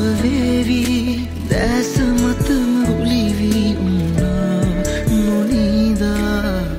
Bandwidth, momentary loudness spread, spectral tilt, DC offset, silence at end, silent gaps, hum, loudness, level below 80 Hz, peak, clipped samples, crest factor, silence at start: 16.5 kHz; 3 LU; -6 dB/octave; under 0.1%; 0 s; none; none; -17 LUFS; -28 dBFS; -4 dBFS; under 0.1%; 12 dB; 0 s